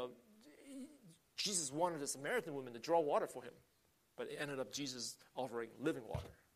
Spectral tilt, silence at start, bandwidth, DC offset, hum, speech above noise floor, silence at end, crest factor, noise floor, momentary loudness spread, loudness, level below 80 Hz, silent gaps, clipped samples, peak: -3 dB/octave; 0 s; 15 kHz; under 0.1%; none; 23 dB; 0.2 s; 20 dB; -65 dBFS; 17 LU; -42 LUFS; -70 dBFS; none; under 0.1%; -24 dBFS